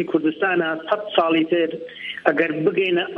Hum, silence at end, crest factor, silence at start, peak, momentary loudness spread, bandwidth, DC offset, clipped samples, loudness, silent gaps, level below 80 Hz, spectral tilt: none; 0 s; 20 dB; 0 s; 0 dBFS; 6 LU; 5.2 kHz; under 0.1%; under 0.1%; -21 LUFS; none; -70 dBFS; -7.5 dB/octave